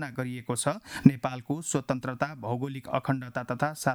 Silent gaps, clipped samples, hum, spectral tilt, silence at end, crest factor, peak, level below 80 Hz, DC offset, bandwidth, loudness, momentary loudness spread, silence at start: none; under 0.1%; none; -5.5 dB/octave; 0 s; 26 dB; -4 dBFS; -60 dBFS; under 0.1%; 18.5 kHz; -29 LUFS; 10 LU; 0 s